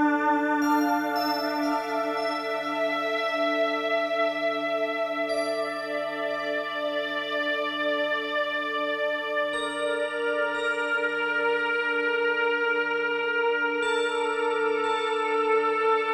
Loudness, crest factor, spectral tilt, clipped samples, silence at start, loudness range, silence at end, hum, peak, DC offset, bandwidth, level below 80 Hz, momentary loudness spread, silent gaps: -26 LUFS; 14 dB; -3 dB/octave; under 0.1%; 0 s; 3 LU; 0 s; none; -12 dBFS; under 0.1%; 14.5 kHz; -72 dBFS; 5 LU; none